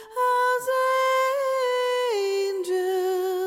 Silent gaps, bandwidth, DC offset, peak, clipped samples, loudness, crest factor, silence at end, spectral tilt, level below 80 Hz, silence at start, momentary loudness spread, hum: none; 16.5 kHz; under 0.1%; -16 dBFS; under 0.1%; -24 LUFS; 8 dB; 0 s; -1 dB/octave; -76 dBFS; 0 s; 4 LU; none